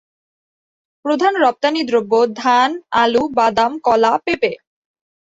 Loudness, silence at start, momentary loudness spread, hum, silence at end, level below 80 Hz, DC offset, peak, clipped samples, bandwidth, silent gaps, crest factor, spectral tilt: -16 LUFS; 1.05 s; 5 LU; none; 0.7 s; -58 dBFS; under 0.1%; -2 dBFS; under 0.1%; 8 kHz; none; 16 dB; -4 dB/octave